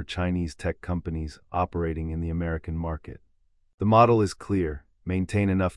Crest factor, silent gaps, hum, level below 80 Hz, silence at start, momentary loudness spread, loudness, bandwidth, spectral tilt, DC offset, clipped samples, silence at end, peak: 22 dB; 3.74-3.78 s; none; -44 dBFS; 0 s; 14 LU; -26 LUFS; 11.5 kHz; -7.5 dB/octave; under 0.1%; under 0.1%; 0 s; -4 dBFS